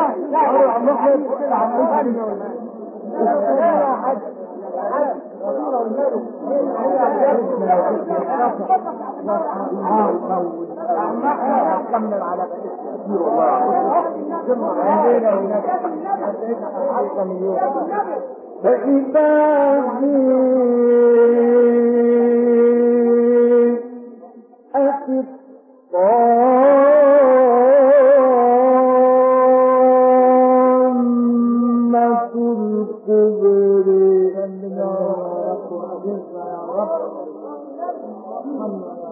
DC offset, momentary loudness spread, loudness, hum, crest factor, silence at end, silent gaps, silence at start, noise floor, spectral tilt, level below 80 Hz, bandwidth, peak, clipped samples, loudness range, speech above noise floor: under 0.1%; 15 LU; -16 LUFS; none; 12 dB; 0 s; none; 0 s; -44 dBFS; -13 dB/octave; -78 dBFS; 3.2 kHz; -4 dBFS; under 0.1%; 9 LU; 28 dB